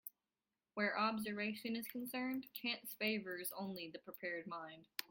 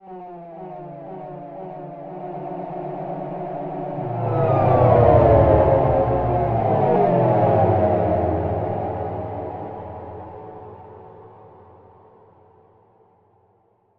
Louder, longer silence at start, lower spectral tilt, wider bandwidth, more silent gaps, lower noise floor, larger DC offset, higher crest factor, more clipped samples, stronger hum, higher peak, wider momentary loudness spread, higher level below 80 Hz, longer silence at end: second, -43 LUFS vs -19 LUFS; about the same, 0.05 s vs 0.05 s; second, -3.5 dB/octave vs -11.5 dB/octave; first, 17 kHz vs 4.7 kHz; neither; first, under -90 dBFS vs -61 dBFS; neither; about the same, 24 dB vs 20 dB; neither; neither; second, -20 dBFS vs 0 dBFS; second, 11 LU vs 22 LU; second, -84 dBFS vs -38 dBFS; second, 0.05 s vs 2.5 s